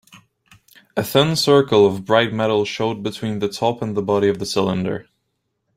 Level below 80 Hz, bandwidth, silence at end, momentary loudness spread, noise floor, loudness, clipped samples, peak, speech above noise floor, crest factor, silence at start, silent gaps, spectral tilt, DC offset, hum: -56 dBFS; 16 kHz; 0.75 s; 11 LU; -73 dBFS; -19 LUFS; under 0.1%; -2 dBFS; 55 dB; 18 dB; 0.15 s; none; -5 dB/octave; under 0.1%; none